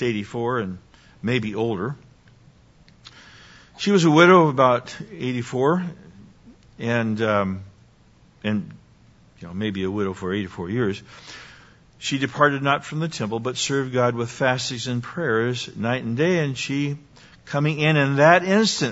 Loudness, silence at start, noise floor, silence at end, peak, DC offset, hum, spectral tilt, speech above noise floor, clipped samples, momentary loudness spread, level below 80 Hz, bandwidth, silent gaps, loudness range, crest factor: -22 LUFS; 0 s; -54 dBFS; 0 s; 0 dBFS; under 0.1%; none; -5.5 dB/octave; 33 dB; under 0.1%; 16 LU; -58 dBFS; 8 kHz; none; 9 LU; 22 dB